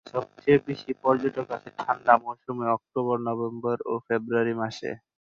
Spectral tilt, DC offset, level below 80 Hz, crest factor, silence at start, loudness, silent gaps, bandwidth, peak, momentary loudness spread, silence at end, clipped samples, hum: -7.5 dB/octave; under 0.1%; -68 dBFS; 22 dB; 0.05 s; -27 LUFS; none; 7.4 kHz; -4 dBFS; 11 LU; 0.25 s; under 0.1%; none